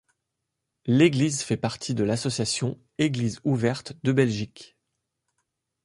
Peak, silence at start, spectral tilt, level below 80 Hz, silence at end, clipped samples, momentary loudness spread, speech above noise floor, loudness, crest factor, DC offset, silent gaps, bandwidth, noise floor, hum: -6 dBFS; 0.85 s; -5.5 dB/octave; -58 dBFS; 1.2 s; under 0.1%; 9 LU; 58 dB; -25 LUFS; 20 dB; under 0.1%; none; 11.5 kHz; -82 dBFS; none